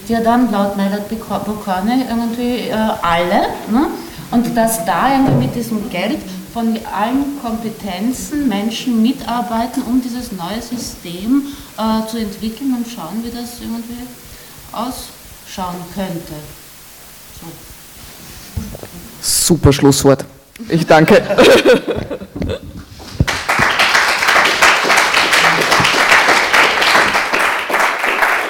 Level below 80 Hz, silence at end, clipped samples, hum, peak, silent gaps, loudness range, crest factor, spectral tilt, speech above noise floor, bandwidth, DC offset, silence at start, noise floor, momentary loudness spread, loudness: -38 dBFS; 0 s; under 0.1%; none; 0 dBFS; none; 16 LU; 16 dB; -4 dB/octave; 22 dB; over 20 kHz; under 0.1%; 0 s; -37 dBFS; 22 LU; -14 LUFS